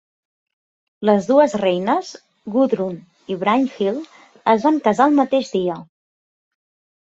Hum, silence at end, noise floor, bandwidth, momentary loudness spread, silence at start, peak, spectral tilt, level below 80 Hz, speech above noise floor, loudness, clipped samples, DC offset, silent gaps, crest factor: none; 1.2 s; under -90 dBFS; 8 kHz; 15 LU; 1 s; -2 dBFS; -6 dB/octave; -64 dBFS; over 73 dB; -18 LUFS; under 0.1%; under 0.1%; none; 18 dB